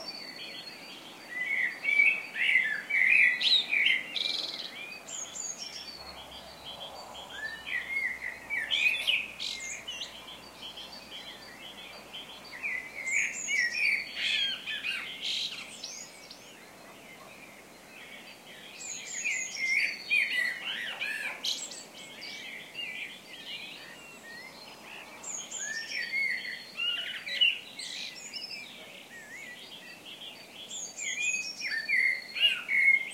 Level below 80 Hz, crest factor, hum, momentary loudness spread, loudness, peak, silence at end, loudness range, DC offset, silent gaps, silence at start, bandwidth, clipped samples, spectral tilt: -72 dBFS; 22 dB; none; 20 LU; -29 LUFS; -10 dBFS; 0 s; 15 LU; under 0.1%; none; 0 s; 16 kHz; under 0.1%; 1 dB/octave